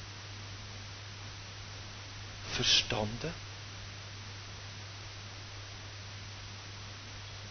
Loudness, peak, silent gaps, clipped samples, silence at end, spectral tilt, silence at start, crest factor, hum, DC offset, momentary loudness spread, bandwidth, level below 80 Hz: -37 LUFS; -12 dBFS; none; under 0.1%; 0 s; -2.5 dB/octave; 0 s; 26 dB; none; under 0.1%; 15 LU; 6.6 kHz; -54 dBFS